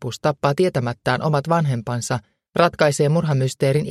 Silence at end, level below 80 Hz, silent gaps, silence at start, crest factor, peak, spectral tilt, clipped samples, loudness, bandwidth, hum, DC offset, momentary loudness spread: 0 s; -54 dBFS; none; 0 s; 18 dB; -2 dBFS; -6 dB/octave; under 0.1%; -20 LUFS; 13.5 kHz; none; under 0.1%; 7 LU